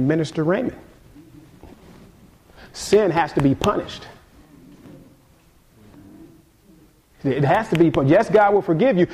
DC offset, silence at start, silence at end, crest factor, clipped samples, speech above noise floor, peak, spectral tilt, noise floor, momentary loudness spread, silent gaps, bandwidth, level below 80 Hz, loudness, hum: under 0.1%; 0 s; 0 s; 16 dB; under 0.1%; 36 dB; -4 dBFS; -6.5 dB/octave; -54 dBFS; 14 LU; none; 15 kHz; -48 dBFS; -19 LUFS; none